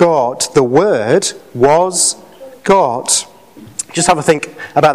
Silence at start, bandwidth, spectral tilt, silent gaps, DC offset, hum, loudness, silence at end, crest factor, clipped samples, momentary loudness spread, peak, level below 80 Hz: 0 s; 16 kHz; -3.5 dB/octave; none; under 0.1%; none; -13 LUFS; 0 s; 12 dB; under 0.1%; 11 LU; 0 dBFS; -48 dBFS